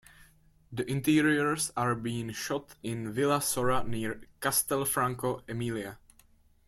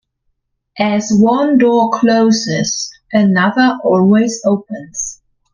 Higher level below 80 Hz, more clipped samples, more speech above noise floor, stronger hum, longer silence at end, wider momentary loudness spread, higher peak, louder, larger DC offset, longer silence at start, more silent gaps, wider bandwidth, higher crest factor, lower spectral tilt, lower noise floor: about the same, -58 dBFS vs -54 dBFS; neither; second, 32 dB vs 55 dB; neither; first, 0.7 s vs 0.4 s; about the same, 11 LU vs 10 LU; second, -12 dBFS vs 0 dBFS; second, -30 LUFS vs -13 LUFS; neither; second, 0.2 s vs 0.75 s; neither; first, 16 kHz vs 9.8 kHz; first, 18 dB vs 12 dB; about the same, -4 dB/octave vs -5 dB/octave; second, -62 dBFS vs -67 dBFS